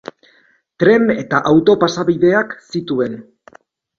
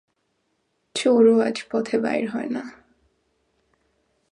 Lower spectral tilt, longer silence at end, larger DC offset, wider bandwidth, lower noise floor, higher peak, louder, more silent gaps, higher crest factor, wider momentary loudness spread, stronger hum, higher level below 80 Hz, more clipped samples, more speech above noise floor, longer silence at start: first, -6.5 dB/octave vs -5 dB/octave; second, 0.75 s vs 1.6 s; neither; second, 7.4 kHz vs 11 kHz; second, -55 dBFS vs -72 dBFS; first, 0 dBFS vs -6 dBFS; first, -15 LUFS vs -22 LUFS; neither; about the same, 16 dB vs 18 dB; second, 12 LU vs 15 LU; neither; first, -54 dBFS vs -70 dBFS; neither; second, 41 dB vs 51 dB; second, 0.8 s vs 0.95 s